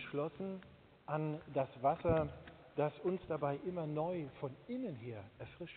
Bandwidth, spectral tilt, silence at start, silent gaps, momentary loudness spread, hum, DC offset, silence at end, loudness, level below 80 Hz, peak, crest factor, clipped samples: 4.5 kHz; -7 dB/octave; 0 s; none; 14 LU; none; under 0.1%; 0 s; -40 LUFS; -64 dBFS; -22 dBFS; 18 dB; under 0.1%